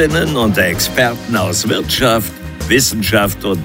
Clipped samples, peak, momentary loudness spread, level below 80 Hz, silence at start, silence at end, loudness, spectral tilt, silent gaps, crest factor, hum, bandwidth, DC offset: under 0.1%; 0 dBFS; 5 LU; -32 dBFS; 0 s; 0 s; -14 LUFS; -3.5 dB/octave; none; 14 dB; none; 16.5 kHz; under 0.1%